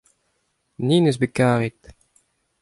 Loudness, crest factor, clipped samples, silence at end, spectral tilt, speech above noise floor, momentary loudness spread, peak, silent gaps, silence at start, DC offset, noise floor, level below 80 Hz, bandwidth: -20 LUFS; 18 dB; under 0.1%; 0.9 s; -6.5 dB/octave; 51 dB; 9 LU; -4 dBFS; none; 0.8 s; under 0.1%; -70 dBFS; -56 dBFS; 11.5 kHz